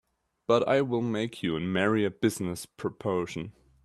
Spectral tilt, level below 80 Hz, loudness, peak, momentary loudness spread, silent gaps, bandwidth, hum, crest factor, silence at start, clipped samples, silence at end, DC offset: -5.5 dB/octave; -64 dBFS; -29 LUFS; -10 dBFS; 11 LU; none; 13.5 kHz; none; 20 dB; 0.5 s; under 0.1%; 0.35 s; under 0.1%